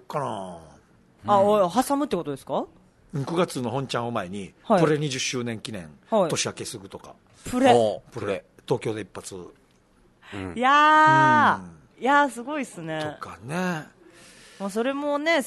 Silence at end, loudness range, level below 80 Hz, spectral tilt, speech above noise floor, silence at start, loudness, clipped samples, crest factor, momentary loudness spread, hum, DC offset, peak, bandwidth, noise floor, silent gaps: 0 s; 7 LU; -60 dBFS; -4.5 dB/octave; 36 dB; 0.1 s; -23 LUFS; under 0.1%; 20 dB; 19 LU; none; under 0.1%; -4 dBFS; 12.5 kHz; -60 dBFS; none